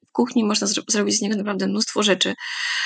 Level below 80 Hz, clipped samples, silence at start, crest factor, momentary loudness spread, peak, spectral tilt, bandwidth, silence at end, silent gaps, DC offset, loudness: -80 dBFS; under 0.1%; 0.15 s; 16 dB; 5 LU; -6 dBFS; -3 dB/octave; 9.4 kHz; 0 s; none; under 0.1%; -21 LUFS